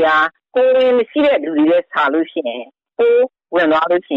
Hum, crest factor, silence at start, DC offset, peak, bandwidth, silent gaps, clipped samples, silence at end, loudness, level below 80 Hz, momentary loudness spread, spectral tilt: none; 10 dB; 0 s; under 0.1%; -6 dBFS; 5.6 kHz; none; under 0.1%; 0 s; -15 LUFS; -60 dBFS; 9 LU; -6 dB/octave